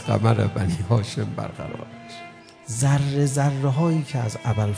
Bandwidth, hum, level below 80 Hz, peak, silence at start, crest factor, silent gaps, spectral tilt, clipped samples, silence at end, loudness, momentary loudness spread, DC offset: 11 kHz; none; -50 dBFS; -4 dBFS; 0 s; 18 dB; none; -6.5 dB/octave; under 0.1%; 0 s; -23 LUFS; 18 LU; under 0.1%